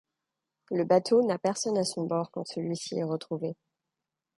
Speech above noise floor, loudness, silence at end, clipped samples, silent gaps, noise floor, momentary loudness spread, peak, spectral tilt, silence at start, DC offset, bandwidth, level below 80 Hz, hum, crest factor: 59 dB; -29 LUFS; 0.85 s; under 0.1%; none; -88 dBFS; 11 LU; -10 dBFS; -5 dB/octave; 0.7 s; under 0.1%; 11.5 kHz; -78 dBFS; none; 20 dB